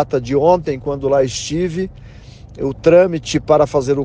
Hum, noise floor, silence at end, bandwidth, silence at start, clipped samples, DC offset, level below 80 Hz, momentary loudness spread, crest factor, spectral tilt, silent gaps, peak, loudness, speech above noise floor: none; -37 dBFS; 0 s; 9.8 kHz; 0 s; under 0.1%; under 0.1%; -40 dBFS; 12 LU; 16 dB; -6 dB/octave; none; 0 dBFS; -16 LUFS; 22 dB